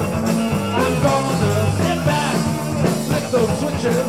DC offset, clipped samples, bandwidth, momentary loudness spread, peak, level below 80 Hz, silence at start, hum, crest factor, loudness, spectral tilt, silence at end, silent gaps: 0.4%; under 0.1%; 16.5 kHz; 3 LU; -4 dBFS; -40 dBFS; 0 s; none; 14 dB; -19 LUFS; -5.5 dB/octave; 0 s; none